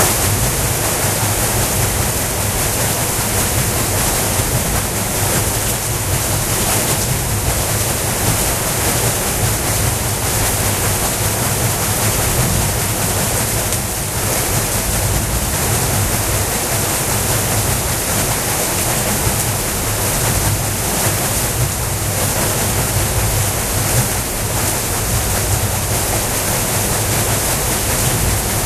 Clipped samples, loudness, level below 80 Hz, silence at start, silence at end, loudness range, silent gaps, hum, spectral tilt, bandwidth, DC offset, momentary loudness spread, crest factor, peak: under 0.1%; -16 LUFS; -28 dBFS; 0 s; 0 s; 1 LU; none; none; -3 dB/octave; 14.5 kHz; under 0.1%; 2 LU; 16 dB; 0 dBFS